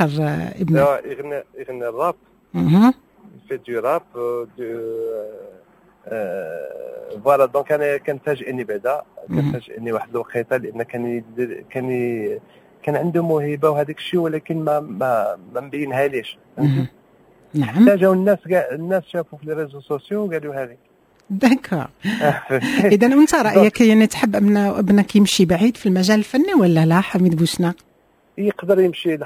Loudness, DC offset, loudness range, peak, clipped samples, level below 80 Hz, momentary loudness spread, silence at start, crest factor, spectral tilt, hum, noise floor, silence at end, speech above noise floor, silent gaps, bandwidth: -19 LUFS; under 0.1%; 9 LU; 0 dBFS; under 0.1%; -54 dBFS; 15 LU; 0 s; 18 dB; -6.5 dB/octave; none; -54 dBFS; 0 s; 36 dB; none; 16 kHz